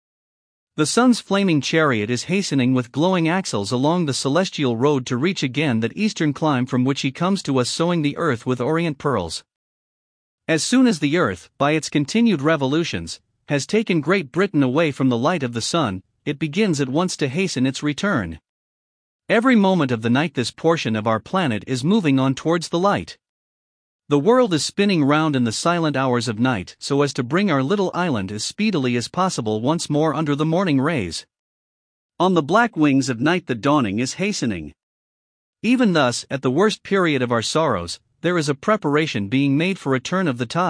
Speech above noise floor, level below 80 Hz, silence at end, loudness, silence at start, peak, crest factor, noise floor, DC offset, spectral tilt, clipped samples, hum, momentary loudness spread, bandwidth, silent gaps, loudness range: over 71 dB; -58 dBFS; 0 s; -20 LUFS; 0.8 s; -2 dBFS; 18 dB; under -90 dBFS; under 0.1%; -5.5 dB/octave; under 0.1%; none; 6 LU; 10.5 kHz; 9.56-10.38 s, 18.49-19.19 s, 23.29-23.99 s, 31.39-32.09 s, 34.83-35.53 s; 2 LU